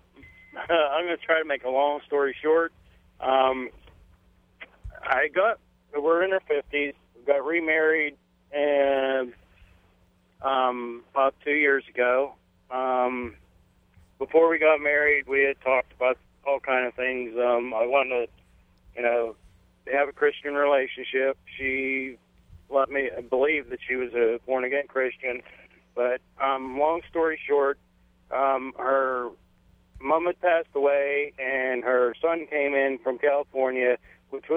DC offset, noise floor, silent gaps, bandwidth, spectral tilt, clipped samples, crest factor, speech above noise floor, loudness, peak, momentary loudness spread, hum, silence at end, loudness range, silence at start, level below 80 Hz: under 0.1%; -63 dBFS; none; 3.8 kHz; -6.5 dB/octave; under 0.1%; 20 dB; 38 dB; -25 LUFS; -6 dBFS; 11 LU; none; 0 s; 4 LU; 0.25 s; -58 dBFS